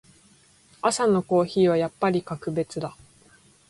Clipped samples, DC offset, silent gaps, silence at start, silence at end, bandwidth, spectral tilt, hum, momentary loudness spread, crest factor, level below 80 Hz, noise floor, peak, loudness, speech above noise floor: under 0.1%; under 0.1%; none; 0.85 s; 0.8 s; 11.5 kHz; -5.5 dB/octave; none; 10 LU; 16 dB; -62 dBFS; -57 dBFS; -8 dBFS; -24 LUFS; 34 dB